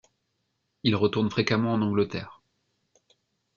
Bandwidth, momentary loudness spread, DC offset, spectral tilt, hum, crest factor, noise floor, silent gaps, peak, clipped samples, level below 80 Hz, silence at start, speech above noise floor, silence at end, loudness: 7.2 kHz; 8 LU; under 0.1%; -6.5 dB/octave; none; 20 dB; -77 dBFS; none; -8 dBFS; under 0.1%; -64 dBFS; 0.85 s; 52 dB; 1.25 s; -26 LUFS